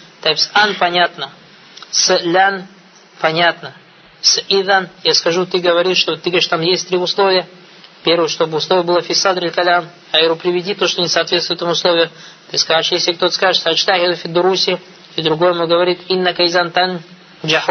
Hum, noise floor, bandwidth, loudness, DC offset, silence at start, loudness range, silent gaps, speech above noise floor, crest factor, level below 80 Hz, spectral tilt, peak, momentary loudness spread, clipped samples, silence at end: none; -39 dBFS; 6.6 kHz; -14 LUFS; under 0.1%; 0.2 s; 1 LU; none; 24 dB; 16 dB; -68 dBFS; -2.5 dB/octave; 0 dBFS; 6 LU; under 0.1%; 0 s